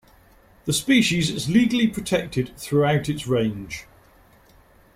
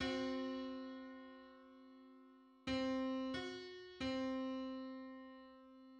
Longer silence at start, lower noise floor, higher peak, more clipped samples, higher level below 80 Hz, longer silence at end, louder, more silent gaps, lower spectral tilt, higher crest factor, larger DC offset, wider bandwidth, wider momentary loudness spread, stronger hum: first, 0.65 s vs 0 s; second, -54 dBFS vs -65 dBFS; first, -6 dBFS vs -28 dBFS; neither; first, -50 dBFS vs -70 dBFS; first, 1.15 s vs 0 s; first, -22 LUFS vs -45 LUFS; neither; about the same, -5 dB/octave vs -5 dB/octave; about the same, 16 dB vs 18 dB; neither; first, 16 kHz vs 9 kHz; second, 13 LU vs 21 LU; neither